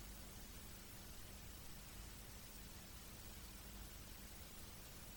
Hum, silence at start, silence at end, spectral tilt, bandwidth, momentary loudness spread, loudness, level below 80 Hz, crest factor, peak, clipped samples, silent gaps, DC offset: none; 0 s; 0 s; -3 dB/octave; 19.5 kHz; 0 LU; -55 LUFS; -60 dBFS; 14 dB; -42 dBFS; under 0.1%; none; under 0.1%